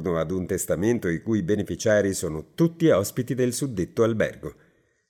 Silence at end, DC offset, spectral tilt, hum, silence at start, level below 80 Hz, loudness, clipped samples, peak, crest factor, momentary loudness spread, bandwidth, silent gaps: 0.6 s; under 0.1%; -5.5 dB/octave; none; 0 s; -54 dBFS; -24 LUFS; under 0.1%; -8 dBFS; 16 dB; 7 LU; 20 kHz; none